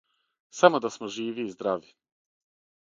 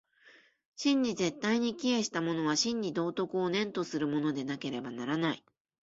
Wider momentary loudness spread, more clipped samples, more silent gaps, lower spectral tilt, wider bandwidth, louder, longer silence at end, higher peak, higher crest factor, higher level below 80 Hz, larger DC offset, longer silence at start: first, 13 LU vs 7 LU; neither; second, none vs 0.66-0.72 s; about the same, -4.5 dB/octave vs -4 dB/octave; about the same, 7.6 kHz vs 8 kHz; first, -26 LUFS vs -32 LUFS; first, 1.05 s vs 0.55 s; first, -2 dBFS vs -16 dBFS; first, 28 dB vs 16 dB; about the same, -76 dBFS vs -72 dBFS; neither; first, 0.55 s vs 0.25 s